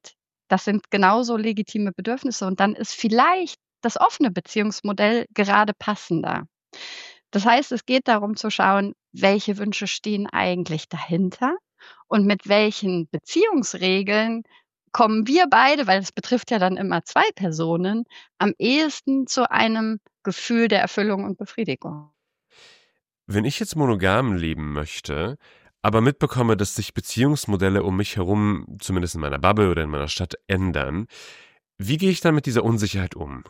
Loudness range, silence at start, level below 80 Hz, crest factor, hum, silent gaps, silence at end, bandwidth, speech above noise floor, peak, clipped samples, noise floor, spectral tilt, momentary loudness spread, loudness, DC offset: 5 LU; 0.05 s; -48 dBFS; 22 dB; none; none; 0 s; 16 kHz; 45 dB; 0 dBFS; under 0.1%; -66 dBFS; -5 dB/octave; 10 LU; -22 LUFS; under 0.1%